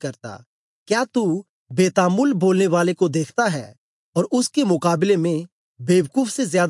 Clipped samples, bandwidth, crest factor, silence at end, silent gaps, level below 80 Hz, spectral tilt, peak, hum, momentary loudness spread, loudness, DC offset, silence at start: under 0.1%; 11.5 kHz; 16 dB; 0 s; 0.46-0.86 s, 1.49-1.66 s, 3.78-4.13 s, 5.52-5.75 s; -74 dBFS; -5.5 dB/octave; -4 dBFS; none; 11 LU; -20 LUFS; under 0.1%; 0.05 s